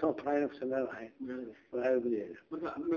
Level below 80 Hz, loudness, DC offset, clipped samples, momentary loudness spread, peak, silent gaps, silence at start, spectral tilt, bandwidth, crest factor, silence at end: -72 dBFS; -36 LUFS; under 0.1%; under 0.1%; 11 LU; -18 dBFS; none; 0 s; -5.5 dB/octave; 6.8 kHz; 18 dB; 0 s